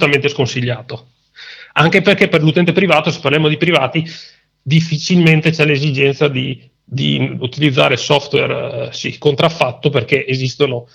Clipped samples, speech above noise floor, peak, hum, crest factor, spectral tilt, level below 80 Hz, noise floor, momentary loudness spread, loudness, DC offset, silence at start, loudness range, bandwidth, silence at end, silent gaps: under 0.1%; 23 dB; 0 dBFS; none; 14 dB; -5.5 dB/octave; -54 dBFS; -37 dBFS; 12 LU; -14 LUFS; under 0.1%; 0 s; 2 LU; 9.2 kHz; 0.1 s; none